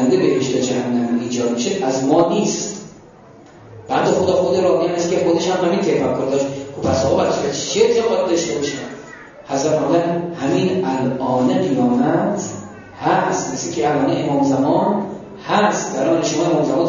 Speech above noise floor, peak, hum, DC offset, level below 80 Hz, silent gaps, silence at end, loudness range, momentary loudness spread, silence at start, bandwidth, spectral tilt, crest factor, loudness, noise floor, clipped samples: 26 dB; -2 dBFS; none; under 0.1%; -56 dBFS; none; 0 s; 2 LU; 8 LU; 0 s; 7.4 kHz; -5 dB/octave; 14 dB; -18 LUFS; -43 dBFS; under 0.1%